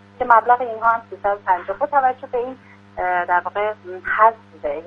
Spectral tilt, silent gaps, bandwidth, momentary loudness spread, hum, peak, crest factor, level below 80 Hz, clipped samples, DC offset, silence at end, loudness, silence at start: -6.5 dB/octave; none; 5.4 kHz; 12 LU; none; 0 dBFS; 20 dB; -54 dBFS; under 0.1%; under 0.1%; 0 s; -19 LUFS; 0.2 s